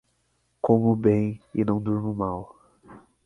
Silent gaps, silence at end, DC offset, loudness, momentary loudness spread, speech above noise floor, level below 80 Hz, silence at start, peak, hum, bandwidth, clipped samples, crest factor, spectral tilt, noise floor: none; 0.25 s; under 0.1%; -24 LUFS; 10 LU; 47 dB; -54 dBFS; 0.65 s; -6 dBFS; none; 3.9 kHz; under 0.1%; 20 dB; -11 dB/octave; -70 dBFS